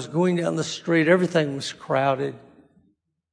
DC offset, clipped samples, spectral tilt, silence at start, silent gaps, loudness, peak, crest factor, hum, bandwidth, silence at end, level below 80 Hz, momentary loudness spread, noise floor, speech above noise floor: under 0.1%; under 0.1%; -5.5 dB/octave; 0 s; none; -23 LUFS; -6 dBFS; 18 dB; none; 10.5 kHz; 0.95 s; -70 dBFS; 9 LU; -67 dBFS; 45 dB